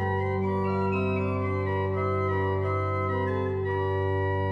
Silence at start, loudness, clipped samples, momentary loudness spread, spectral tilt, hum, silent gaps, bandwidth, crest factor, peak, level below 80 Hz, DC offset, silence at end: 0 s; -27 LUFS; under 0.1%; 1 LU; -9.5 dB/octave; none; none; 5 kHz; 10 dB; -16 dBFS; -58 dBFS; under 0.1%; 0 s